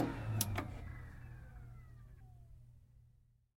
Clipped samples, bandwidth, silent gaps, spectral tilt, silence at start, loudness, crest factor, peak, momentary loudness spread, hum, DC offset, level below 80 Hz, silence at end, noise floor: under 0.1%; 16.5 kHz; none; -4.5 dB/octave; 0 s; -43 LUFS; 30 dB; -14 dBFS; 24 LU; none; under 0.1%; -56 dBFS; 0.4 s; -69 dBFS